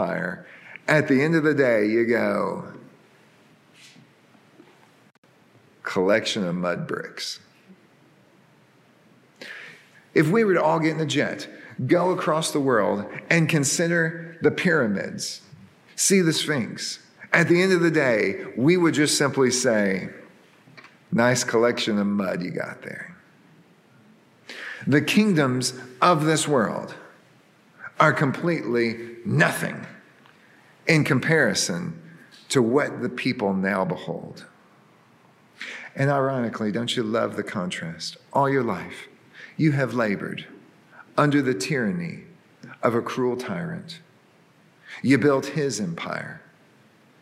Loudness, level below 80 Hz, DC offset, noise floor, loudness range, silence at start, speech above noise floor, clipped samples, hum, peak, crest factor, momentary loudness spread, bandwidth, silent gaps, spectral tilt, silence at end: -23 LUFS; -72 dBFS; under 0.1%; -57 dBFS; 7 LU; 0 s; 34 dB; under 0.1%; none; -2 dBFS; 22 dB; 18 LU; 16 kHz; 5.18-5.23 s; -4.5 dB/octave; 0.8 s